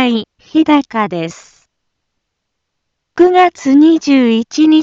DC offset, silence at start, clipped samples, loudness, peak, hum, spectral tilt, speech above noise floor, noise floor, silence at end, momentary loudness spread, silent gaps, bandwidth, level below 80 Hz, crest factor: under 0.1%; 0 s; under 0.1%; -11 LUFS; 0 dBFS; none; -5 dB/octave; 63 dB; -73 dBFS; 0 s; 11 LU; none; 7.6 kHz; -56 dBFS; 12 dB